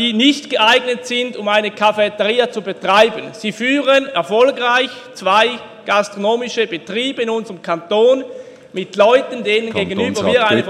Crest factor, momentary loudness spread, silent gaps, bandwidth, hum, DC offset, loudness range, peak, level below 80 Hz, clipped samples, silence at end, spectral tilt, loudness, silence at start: 16 dB; 10 LU; none; 13 kHz; none; under 0.1%; 3 LU; 0 dBFS; -62 dBFS; under 0.1%; 0 s; -4 dB/octave; -15 LUFS; 0 s